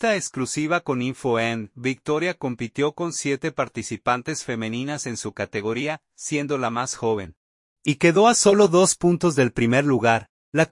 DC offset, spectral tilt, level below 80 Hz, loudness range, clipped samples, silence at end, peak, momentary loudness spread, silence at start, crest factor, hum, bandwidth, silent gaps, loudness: under 0.1%; -4.5 dB/octave; -58 dBFS; 8 LU; under 0.1%; 0.05 s; -4 dBFS; 12 LU; 0 s; 18 dB; none; 11.5 kHz; 7.37-7.76 s, 10.29-10.52 s; -22 LUFS